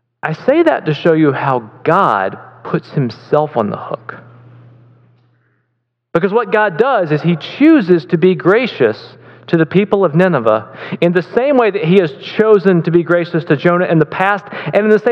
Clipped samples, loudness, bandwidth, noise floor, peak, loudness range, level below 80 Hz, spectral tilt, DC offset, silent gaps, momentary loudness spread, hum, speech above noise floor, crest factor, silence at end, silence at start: 0.2%; -13 LUFS; 6.6 kHz; -69 dBFS; 0 dBFS; 8 LU; -60 dBFS; -8.5 dB/octave; under 0.1%; none; 9 LU; none; 56 dB; 14 dB; 0 s; 0.25 s